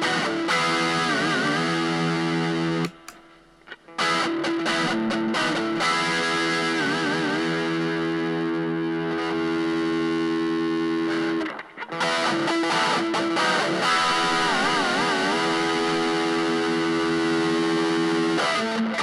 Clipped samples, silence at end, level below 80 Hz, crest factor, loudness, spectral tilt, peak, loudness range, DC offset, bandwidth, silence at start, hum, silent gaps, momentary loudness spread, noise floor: under 0.1%; 0 s; -64 dBFS; 12 dB; -23 LUFS; -4 dB/octave; -12 dBFS; 4 LU; under 0.1%; 12 kHz; 0 s; none; none; 5 LU; -52 dBFS